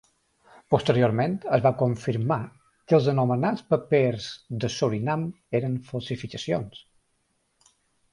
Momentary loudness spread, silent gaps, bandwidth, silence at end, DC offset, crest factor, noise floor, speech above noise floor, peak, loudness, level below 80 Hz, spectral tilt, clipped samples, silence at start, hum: 11 LU; none; 11 kHz; 1.35 s; under 0.1%; 20 dB; -72 dBFS; 47 dB; -6 dBFS; -25 LUFS; -58 dBFS; -7 dB/octave; under 0.1%; 0.7 s; none